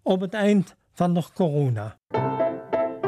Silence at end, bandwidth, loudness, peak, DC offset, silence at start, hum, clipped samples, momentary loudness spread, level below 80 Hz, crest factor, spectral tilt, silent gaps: 0 s; 13 kHz; -24 LUFS; -8 dBFS; under 0.1%; 0.05 s; none; under 0.1%; 7 LU; -64 dBFS; 16 dB; -8 dB/octave; none